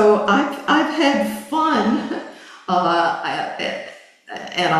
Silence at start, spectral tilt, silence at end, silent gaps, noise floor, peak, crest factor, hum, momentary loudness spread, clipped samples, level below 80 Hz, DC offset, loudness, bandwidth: 0 s; -5 dB/octave; 0 s; none; -39 dBFS; -2 dBFS; 16 dB; none; 17 LU; under 0.1%; -62 dBFS; under 0.1%; -19 LUFS; 14 kHz